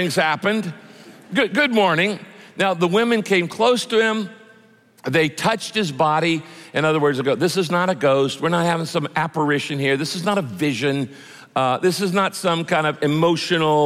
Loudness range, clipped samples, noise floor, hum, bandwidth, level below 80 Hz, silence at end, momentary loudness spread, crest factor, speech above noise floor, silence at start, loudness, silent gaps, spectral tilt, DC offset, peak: 2 LU; under 0.1%; -52 dBFS; none; 15.5 kHz; -66 dBFS; 0 s; 7 LU; 14 dB; 33 dB; 0 s; -20 LUFS; none; -5 dB/octave; under 0.1%; -6 dBFS